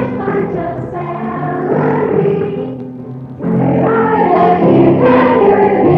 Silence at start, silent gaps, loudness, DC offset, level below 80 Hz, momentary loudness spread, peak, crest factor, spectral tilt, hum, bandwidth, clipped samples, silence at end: 0 s; none; -12 LUFS; under 0.1%; -44 dBFS; 13 LU; -2 dBFS; 10 dB; -10.5 dB/octave; none; 5.6 kHz; under 0.1%; 0 s